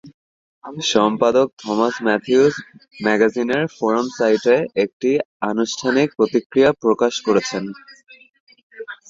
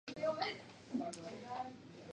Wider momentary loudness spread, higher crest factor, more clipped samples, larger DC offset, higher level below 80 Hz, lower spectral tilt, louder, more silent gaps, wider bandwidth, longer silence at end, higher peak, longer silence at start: about the same, 9 LU vs 11 LU; about the same, 18 dB vs 20 dB; neither; neither; first, -60 dBFS vs -78 dBFS; about the same, -4.5 dB/octave vs -4.5 dB/octave; first, -18 LUFS vs -43 LUFS; first, 0.14-0.62 s, 1.53-1.57 s, 4.93-5.00 s, 5.25-5.40 s, 6.46-6.50 s, 8.40-8.47 s, 8.63-8.70 s vs none; second, 7.8 kHz vs 10 kHz; about the same, 0.15 s vs 0.05 s; first, -2 dBFS vs -24 dBFS; about the same, 0.05 s vs 0.05 s